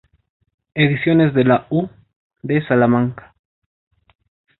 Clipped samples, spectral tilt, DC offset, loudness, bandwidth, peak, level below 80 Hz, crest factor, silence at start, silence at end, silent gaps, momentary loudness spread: under 0.1%; -12 dB/octave; under 0.1%; -17 LUFS; 4.2 kHz; -2 dBFS; -54 dBFS; 18 dB; 0.75 s; 1.45 s; 2.16-2.30 s; 15 LU